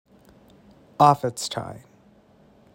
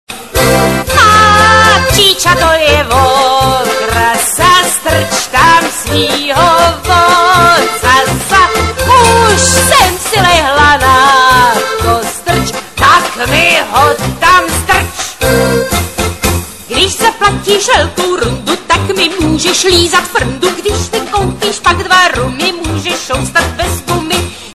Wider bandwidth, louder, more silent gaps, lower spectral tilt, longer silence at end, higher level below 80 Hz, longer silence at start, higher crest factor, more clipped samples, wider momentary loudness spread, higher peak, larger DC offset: about the same, 16 kHz vs 16 kHz; second, -22 LUFS vs -8 LUFS; neither; first, -5 dB/octave vs -3 dB/octave; first, 1 s vs 0 s; second, -62 dBFS vs -26 dBFS; first, 1 s vs 0.1 s; first, 24 dB vs 10 dB; second, under 0.1% vs 0.2%; first, 21 LU vs 8 LU; about the same, -2 dBFS vs 0 dBFS; second, under 0.1% vs 0.9%